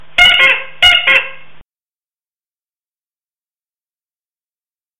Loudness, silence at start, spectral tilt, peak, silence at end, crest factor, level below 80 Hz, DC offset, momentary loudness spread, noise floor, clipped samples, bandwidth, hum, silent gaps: -8 LUFS; 0 s; 0 dB/octave; 0 dBFS; 3.4 s; 16 dB; -44 dBFS; under 0.1%; 6 LU; under -90 dBFS; under 0.1%; 17 kHz; none; none